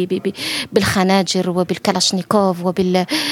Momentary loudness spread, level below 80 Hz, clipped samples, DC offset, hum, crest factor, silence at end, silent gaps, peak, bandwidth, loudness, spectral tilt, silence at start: 6 LU; -50 dBFS; under 0.1%; under 0.1%; none; 18 dB; 0 s; none; 0 dBFS; 16.5 kHz; -17 LUFS; -4.5 dB/octave; 0 s